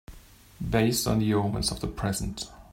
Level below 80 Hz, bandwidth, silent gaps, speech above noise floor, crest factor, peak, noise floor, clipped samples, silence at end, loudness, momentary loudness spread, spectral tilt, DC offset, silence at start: -42 dBFS; 16.5 kHz; none; 24 dB; 18 dB; -10 dBFS; -51 dBFS; under 0.1%; 0.1 s; -27 LUFS; 11 LU; -5 dB/octave; under 0.1%; 0.1 s